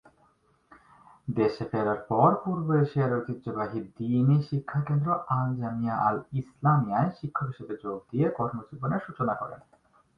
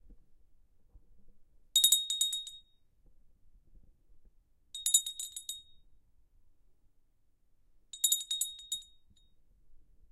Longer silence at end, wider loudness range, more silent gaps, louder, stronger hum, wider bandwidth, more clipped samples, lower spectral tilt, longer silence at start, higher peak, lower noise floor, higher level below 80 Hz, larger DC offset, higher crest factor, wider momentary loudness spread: first, 0.6 s vs 0.35 s; about the same, 3 LU vs 5 LU; neither; about the same, -28 LUFS vs -30 LUFS; neither; second, 5.2 kHz vs 16 kHz; neither; first, -10.5 dB/octave vs 4 dB/octave; first, 1.25 s vs 0.05 s; about the same, -8 dBFS vs -8 dBFS; about the same, -66 dBFS vs -68 dBFS; about the same, -62 dBFS vs -66 dBFS; neither; second, 20 dB vs 30 dB; second, 11 LU vs 21 LU